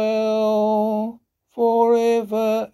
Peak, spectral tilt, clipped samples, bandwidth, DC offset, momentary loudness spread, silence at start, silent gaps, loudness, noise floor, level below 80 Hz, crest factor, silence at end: -6 dBFS; -6 dB/octave; under 0.1%; 13 kHz; under 0.1%; 9 LU; 0 s; none; -19 LUFS; -40 dBFS; -68 dBFS; 12 dB; 0.05 s